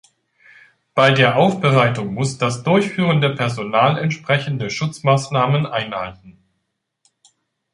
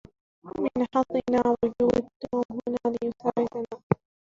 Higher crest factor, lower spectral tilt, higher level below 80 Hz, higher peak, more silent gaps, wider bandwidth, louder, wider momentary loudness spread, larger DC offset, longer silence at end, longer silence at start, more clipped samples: second, 18 dB vs 24 dB; second, -6 dB/octave vs -8 dB/octave; about the same, -56 dBFS vs -58 dBFS; about the same, -2 dBFS vs -4 dBFS; second, none vs 2.16-2.20 s, 2.45-2.49 s, 3.83-3.90 s; first, 11.5 kHz vs 7.4 kHz; first, -18 LUFS vs -27 LUFS; about the same, 9 LU vs 7 LU; neither; first, 1.4 s vs 0.4 s; first, 0.95 s vs 0.45 s; neither